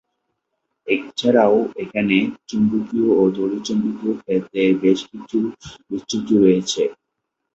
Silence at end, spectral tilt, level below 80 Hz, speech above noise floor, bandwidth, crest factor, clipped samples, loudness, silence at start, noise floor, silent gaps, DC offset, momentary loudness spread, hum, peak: 0.65 s; -5.5 dB/octave; -58 dBFS; 59 dB; 8.2 kHz; 18 dB; under 0.1%; -19 LUFS; 0.85 s; -78 dBFS; none; under 0.1%; 10 LU; none; -2 dBFS